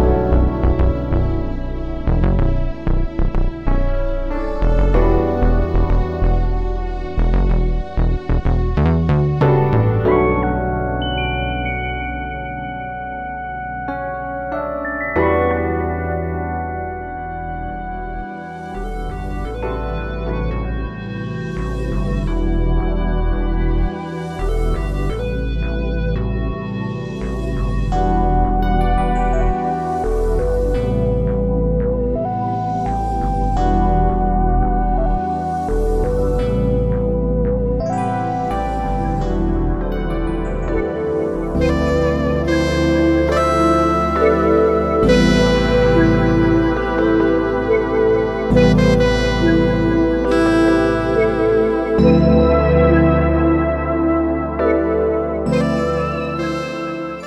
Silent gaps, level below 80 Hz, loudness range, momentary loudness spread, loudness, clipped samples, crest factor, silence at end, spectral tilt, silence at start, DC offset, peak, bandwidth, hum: none; -22 dBFS; 9 LU; 11 LU; -18 LUFS; under 0.1%; 14 dB; 0 s; -7.5 dB/octave; 0 s; under 0.1%; -2 dBFS; 9.4 kHz; none